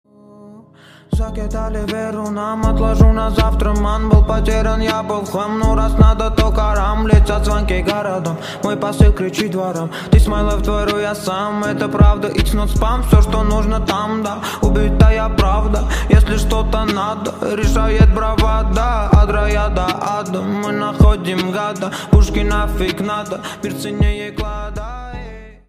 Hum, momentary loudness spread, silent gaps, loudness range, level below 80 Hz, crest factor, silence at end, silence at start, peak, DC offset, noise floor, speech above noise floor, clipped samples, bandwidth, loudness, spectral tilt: none; 10 LU; none; 2 LU; -18 dBFS; 14 dB; 0.15 s; 0.45 s; 0 dBFS; under 0.1%; -43 dBFS; 29 dB; under 0.1%; 15 kHz; -16 LUFS; -6.5 dB/octave